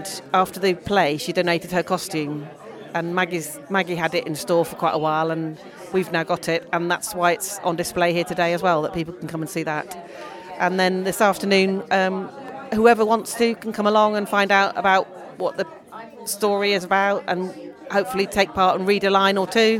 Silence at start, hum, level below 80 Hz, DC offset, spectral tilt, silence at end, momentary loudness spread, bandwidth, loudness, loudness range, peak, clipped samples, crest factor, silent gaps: 0 s; none; -56 dBFS; under 0.1%; -4.5 dB/octave; 0 s; 12 LU; 17.5 kHz; -21 LUFS; 4 LU; -2 dBFS; under 0.1%; 18 dB; none